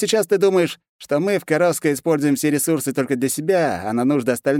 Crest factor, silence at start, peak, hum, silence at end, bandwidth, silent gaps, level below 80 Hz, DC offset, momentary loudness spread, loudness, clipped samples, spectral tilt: 14 dB; 0 s; -4 dBFS; none; 0 s; 17 kHz; 0.89-0.99 s; -64 dBFS; under 0.1%; 5 LU; -19 LUFS; under 0.1%; -5 dB/octave